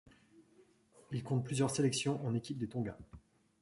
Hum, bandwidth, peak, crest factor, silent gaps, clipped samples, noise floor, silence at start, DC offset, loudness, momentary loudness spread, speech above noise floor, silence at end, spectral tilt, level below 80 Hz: none; 11.5 kHz; -20 dBFS; 18 dB; none; under 0.1%; -67 dBFS; 0.4 s; under 0.1%; -37 LUFS; 12 LU; 31 dB; 0.45 s; -5.5 dB/octave; -66 dBFS